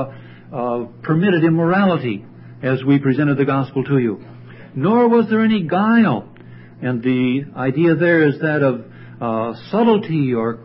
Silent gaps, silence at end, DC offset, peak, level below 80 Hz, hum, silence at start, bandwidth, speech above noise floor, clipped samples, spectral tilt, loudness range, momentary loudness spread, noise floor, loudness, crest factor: none; 0 s; under 0.1%; -2 dBFS; -60 dBFS; none; 0 s; 5.8 kHz; 23 dB; under 0.1%; -12.5 dB/octave; 2 LU; 12 LU; -39 dBFS; -17 LUFS; 14 dB